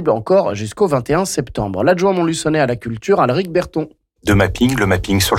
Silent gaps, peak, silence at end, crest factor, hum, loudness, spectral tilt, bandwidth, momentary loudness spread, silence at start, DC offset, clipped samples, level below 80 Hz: none; -4 dBFS; 0 s; 12 dB; none; -16 LUFS; -5.5 dB/octave; 16.5 kHz; 8 LU; 0 s; under 0.1%; under 0.1%; -36 dBFS